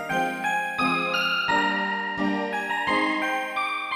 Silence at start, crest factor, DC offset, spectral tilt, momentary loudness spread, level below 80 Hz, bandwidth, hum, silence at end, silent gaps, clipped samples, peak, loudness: 0 s; 14 dB; under 0.1%; -4 dB/octave; 4 LU; -60 dBFS; 15.5 kHz; none; 0 s; none; under 0.1%; -10 dBFS; -24 LUFS